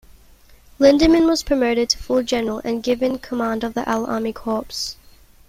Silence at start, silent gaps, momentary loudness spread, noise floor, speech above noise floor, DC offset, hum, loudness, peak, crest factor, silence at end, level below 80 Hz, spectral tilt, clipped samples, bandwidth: 0.8 s; none; 10 LU; -48 dBFS; 30 dB; under 0.1%; none; -19 LUFS; -2 dBFS; 18 dB; 0.55 s; -42 dBFS; -4 dB/octave; under 0.1%; 16 kHz